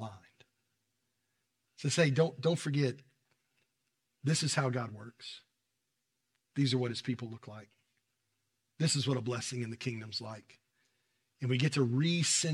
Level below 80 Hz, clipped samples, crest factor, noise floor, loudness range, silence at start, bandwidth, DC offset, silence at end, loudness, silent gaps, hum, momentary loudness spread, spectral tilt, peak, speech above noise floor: -82 dBFS; under 0.1%; 22 dB; -84 dBFS; 5 LU; 0 s; 12.5 kHz; under 0.1%; 0 s; -33 LUFS; none; none; 18 LU; -4.5 dB/octave; -14 dBFS; 51 dB